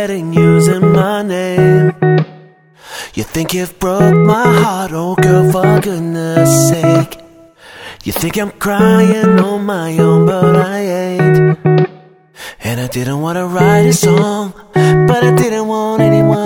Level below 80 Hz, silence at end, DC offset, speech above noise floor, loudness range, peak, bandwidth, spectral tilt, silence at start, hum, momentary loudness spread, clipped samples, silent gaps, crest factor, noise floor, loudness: -42 dBFS; 0 s; under 0.1%; 30 dB; 3 LU; 0 dBFS; 19.5 kHz; -6.5 dB/octave; 0 s; none; 11 LU; under 0.1%; none; 12 dB; -41 dBFS; -11 LUFS